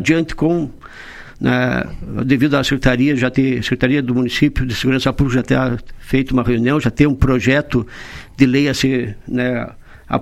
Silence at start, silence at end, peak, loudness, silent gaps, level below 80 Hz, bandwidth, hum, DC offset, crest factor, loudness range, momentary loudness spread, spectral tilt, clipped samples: 0 s; 0 s; 0 dBFS; -17 LUFS; none; -32 dBFS; 13.5 kHz; none; under 0.1%; 16 dB; 1 LU; 12 LU; -6.5 dB/octave; under 0.1%